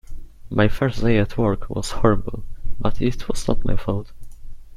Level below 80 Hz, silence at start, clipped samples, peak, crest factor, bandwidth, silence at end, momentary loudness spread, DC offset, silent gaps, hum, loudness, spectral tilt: -28 dBFS; 0.1 s; under 0.1%; -2 dBFS; 18 dB; 11.5 kHz; 0 s; 11 LU; under 0.1%; none; none; -23 LUFS; -6.5 dB/octave